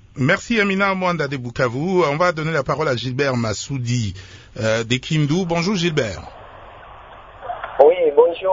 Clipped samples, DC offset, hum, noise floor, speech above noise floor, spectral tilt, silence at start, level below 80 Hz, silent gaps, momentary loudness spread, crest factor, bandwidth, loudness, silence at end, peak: under 0.1%; under 0.1%; none; -40 dBFS; 21 dB; -5.5 dB/octave; 0.15 s; -48 dBFS; none; 14 LU; 20 dB; 7.8 kHz; -19 LUFS; 0 s; 0 dBFS